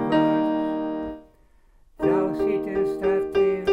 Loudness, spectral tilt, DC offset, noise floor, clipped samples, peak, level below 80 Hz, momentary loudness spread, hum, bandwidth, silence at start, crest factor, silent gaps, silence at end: -24 LUFS; -7.5 dB/octave; under 0.1%; -56 dBFS; under 0.1%; -8 dBFS; -50 dBFS; 9 LU; none; 8.2 kHz; 0 s; 14 dB; none; 0 s